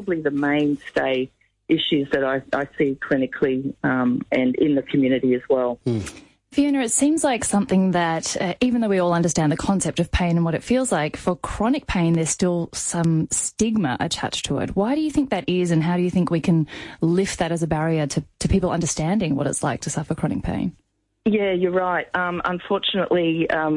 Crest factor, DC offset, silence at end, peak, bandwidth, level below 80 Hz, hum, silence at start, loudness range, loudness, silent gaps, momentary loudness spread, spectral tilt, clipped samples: 14 dB; under 0.1%; 0 s; -8 dBFS; 11.5 kHz; -42 dBFS; none; 0 s; 3 LU; -22 LUFS; none; 5 LU; -5 dB/octave; under 0.1%